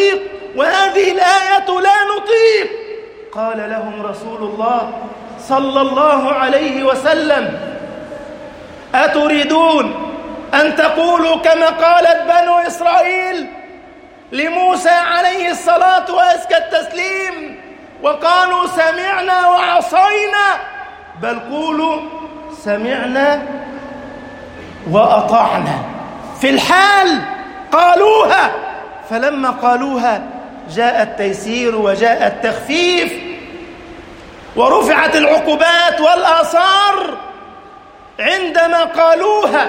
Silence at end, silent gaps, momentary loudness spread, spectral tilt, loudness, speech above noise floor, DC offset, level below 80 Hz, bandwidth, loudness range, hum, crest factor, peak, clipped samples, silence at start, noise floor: 0 s; none; 19 LU; -3.5 dB/octave; -13 LUFS; 26 dB; under 0.1%; -50 dBFS; 16.5 kHz; 5 LU; none; 14 dB; 0 dBFS; under 0.1%; 0 s; -39 dBFS